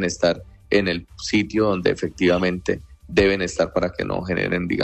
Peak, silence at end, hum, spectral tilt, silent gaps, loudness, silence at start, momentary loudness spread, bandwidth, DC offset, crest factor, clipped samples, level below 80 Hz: -6 dBFS; 0 s; none; -5 dB/octave; none; -22 LUFS; 0 s; 7 LU; 9.4 kHz; under 0.1%; 16 dB; under 0.1%; -42 dBFS